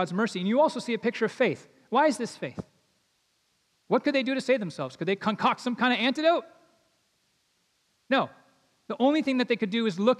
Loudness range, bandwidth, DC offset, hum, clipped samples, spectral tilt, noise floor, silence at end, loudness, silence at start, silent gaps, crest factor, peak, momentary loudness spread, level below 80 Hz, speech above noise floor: 4 LU; 12 kHz; under 0.1%; none; under 0.1%; -5 dB/octave; -72 dBFS; 0 s; -27 LUFS; 0 s; none; 18 dB; -10 dBFS; 11 LU; -76 dBFS; 46 dB